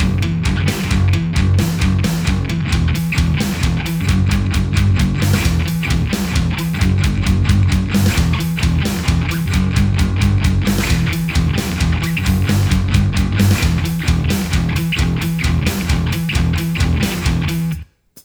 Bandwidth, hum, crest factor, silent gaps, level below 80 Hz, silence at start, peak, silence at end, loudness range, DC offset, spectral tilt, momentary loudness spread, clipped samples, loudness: over 20 kHz; none; 14 dB; none; -22 dBFS; 0 s; 0 dBFS; 0.05 s; 1 LU; under 0.1%; -5.5 dB/octave; 3 LU; under 0.1%; -17 LUFS